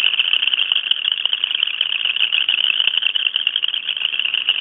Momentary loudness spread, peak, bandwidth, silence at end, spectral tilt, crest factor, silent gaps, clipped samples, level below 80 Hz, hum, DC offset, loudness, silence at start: 3 LU; 0 dBFS; 4.1 kHz; 0 s; -2.5 dB/octave; 18 dB; none; under 0.1%; -76 dBFS; none; under 0.1%; -16 LUFS; 0 s